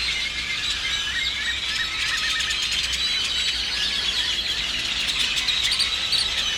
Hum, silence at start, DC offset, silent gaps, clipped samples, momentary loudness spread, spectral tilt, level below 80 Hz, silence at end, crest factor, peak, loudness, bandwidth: none; 0 s; under 0.1%; none; under 0.1%; 3 LU; 0.5 dB/octave; -44 dBFS; 0 s; 16 dB; -8 dBFS; -21 LUFS; 19.5 kHz